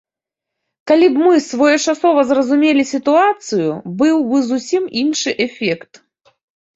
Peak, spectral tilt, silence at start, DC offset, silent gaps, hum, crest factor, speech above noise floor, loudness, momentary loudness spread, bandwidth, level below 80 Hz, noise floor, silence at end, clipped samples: -2 dBFS; -4 dB/octave; 0.85 s; under 0.1%; none; none; 14 dB; 70 dB; -15 LUFS; 7 LU; 8 kHz; -60 dBFS; -84 dBFS; 1 s; under 0.1%